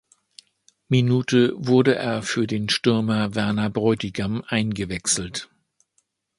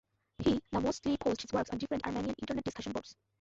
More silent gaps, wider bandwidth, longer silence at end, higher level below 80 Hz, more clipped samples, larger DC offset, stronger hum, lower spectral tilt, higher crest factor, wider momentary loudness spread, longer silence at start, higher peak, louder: neither; first, 11.5 kHz vs 8 kHz; first, 0.95 s vs 0.3 s; about the same, -52 dBFS vs -56 dBFS; neither; neither; neither; about the same, -5 dB/octave vs -5.5 dB/octave; about the same, 18 dB vs 18 dB; about the same, 7 LU vs 8 LU; first, 0.9 s vs 0.4 s; first, -4 dBFS vs -18 dBFS; first, -22 LUFS vs -35 LUFS